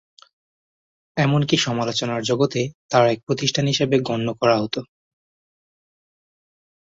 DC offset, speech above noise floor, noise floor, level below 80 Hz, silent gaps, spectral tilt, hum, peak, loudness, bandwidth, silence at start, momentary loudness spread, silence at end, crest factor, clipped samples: under 0.1%; over 70 dB; under -90 dBFS; -60 dBFS; 2.74-2.89 s, 3.23-3.27 s; -5 dB/octave; none; -4 dBFS; -21 LUFS; 7.8 kHz; 1.15 s; 7 LU; 2 s; 20 dB; under 0.1%